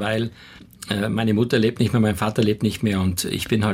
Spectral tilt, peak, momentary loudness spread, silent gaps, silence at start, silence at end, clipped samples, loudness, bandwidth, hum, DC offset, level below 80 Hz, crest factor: -5.5 dB/octave; -8 dBFS; 6 LU; none; 0 s; 0 s; under 0.1%; -21 LUFS; 16.5 kHz; none; under 0.1%; -50 dBFS; 14 dB